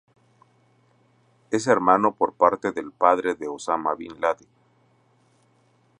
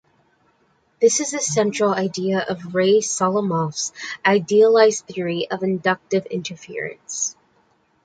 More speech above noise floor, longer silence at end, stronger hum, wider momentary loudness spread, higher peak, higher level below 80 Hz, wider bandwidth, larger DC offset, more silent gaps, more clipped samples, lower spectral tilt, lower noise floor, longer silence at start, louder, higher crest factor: about the same, 40 dB vs 43 dB; first, 1.65 s vs 0.7 s; neither; about the same, 10 LU vs 12 LU; about the same, -2 dBFS vs -2 dBFS; about the same, -66 dBFS vs -66 dBFS; first, 11 kHz vs 9.4 kHz; neither; neither; neither; about the same, -5 dB/octave vs -4 dB/octave; about the same, -62 dBFS vs -62 dBFS; first, 1.5 s vs 1 s; second, -23 LUFS vs -20 LUFS; about the same, 22 dB vs 18 dB